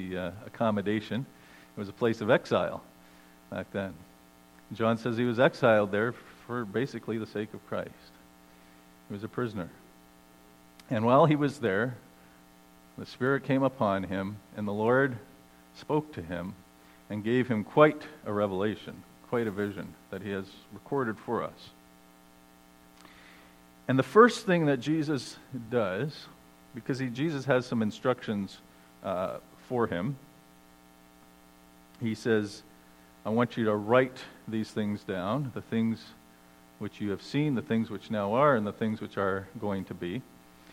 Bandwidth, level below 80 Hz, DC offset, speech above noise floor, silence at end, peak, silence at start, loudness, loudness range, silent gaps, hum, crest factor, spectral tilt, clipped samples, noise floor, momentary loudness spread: 16.5 kHz; -68 dBFS; under 0.1%; 28 dB; 0.5 s; -6 dBFS; 0 s; -30 LUFS; 9 LU; none; none; 24 dB; -7 dB/octave; under 0.1%; -57 dBFS; 18 LU